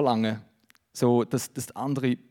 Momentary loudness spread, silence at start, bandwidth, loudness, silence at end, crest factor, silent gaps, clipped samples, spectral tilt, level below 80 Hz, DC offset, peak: 12 LU; 0 s; 18 kHz; -27 LUFS; 0.15 s; 18 dB; none; under 0.1%; -6 dB/octave; -74 dBFS; under 0.1%; -10 dBFS